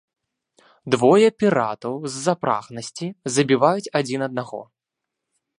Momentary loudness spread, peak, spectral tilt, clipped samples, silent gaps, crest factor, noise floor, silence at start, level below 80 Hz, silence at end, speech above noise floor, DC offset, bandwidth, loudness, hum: 15 LU; -2 dBFS; -5 dB/octave; under 0.1%; none; 20 dB; -83 dBFS; 0.85 s; -68 dBFS; 0.95 s; 63 dB; under 0.1%; 11.5 kHz; -21 LUFS; none